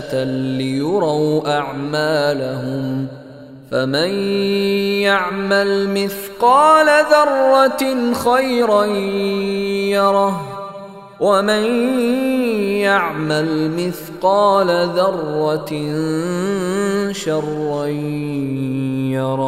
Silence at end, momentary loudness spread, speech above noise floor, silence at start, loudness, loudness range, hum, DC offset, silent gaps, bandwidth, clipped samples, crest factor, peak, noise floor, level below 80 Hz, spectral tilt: 0 s; 9 LU; 21 dB; 0 s; -17 LUFS; 6 LU; none; under 0.1%; none; 16 kHz; under 0.1%; 16 dB; 0 dBFS; -37 dBFS; -54 dBFS; -5.5 dB/octave